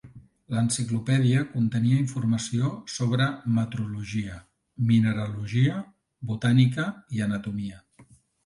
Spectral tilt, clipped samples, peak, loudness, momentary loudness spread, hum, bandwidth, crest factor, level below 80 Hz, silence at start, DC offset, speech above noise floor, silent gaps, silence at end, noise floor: -6 dB/octave; under 0.1%; -8 dBFS; -26 LUFS; 12 LU; none; 11.5 kHz; 18 dB; -56 dBFS; 0.05 s; under 0.1%; 32 dB; none; 0.45 s; -56 dBFS